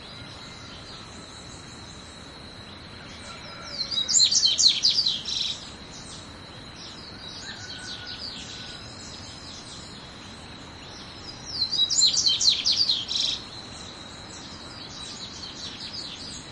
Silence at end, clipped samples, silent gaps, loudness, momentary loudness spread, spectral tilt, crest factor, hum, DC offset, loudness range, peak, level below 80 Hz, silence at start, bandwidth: 0 s; under 0.1%; none; -22 LUFS; 23 LU; 0 dB/octave; 22 dB; none; under 0.1%; 16 LU; -6 dBFS; -56 dBFS; 0 s; 11.5 kHz